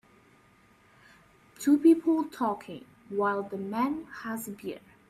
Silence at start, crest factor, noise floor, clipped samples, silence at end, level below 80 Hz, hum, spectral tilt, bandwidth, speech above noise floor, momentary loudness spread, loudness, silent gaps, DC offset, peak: 1.6 s; 18 dB; -61 dBFS; under 0.1%; 0.3 s; -70 dBFS; none; -6 dB/octave; 15 kHz; 33 dB; 18 LU; -28 LUFS; none; under 0.1%; -12 dBFS